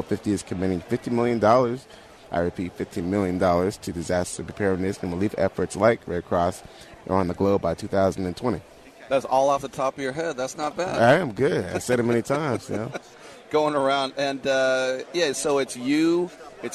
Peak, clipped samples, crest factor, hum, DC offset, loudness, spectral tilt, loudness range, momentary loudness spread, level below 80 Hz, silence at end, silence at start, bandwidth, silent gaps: -6 dBFS; under 0.1%; 18 dB; none; under 0.1%; -24 LUFS; -5.5 dB/octave; 2 LU; 10 LU; -54 dBFS; 0 s; 0 s; 13.5 kHz; none